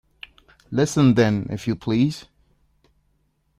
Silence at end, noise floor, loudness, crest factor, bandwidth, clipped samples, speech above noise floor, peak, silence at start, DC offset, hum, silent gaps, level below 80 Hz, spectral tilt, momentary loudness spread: 1.4 s; -67 dBFS; -21 LUFS; 18 dB; 14 kHz; under 0.1%; 47 dB; -4 dBFS; 0.7 s; under 0.1%; none; none; -54 dBFS; -6.5 dB/octave; 26 LU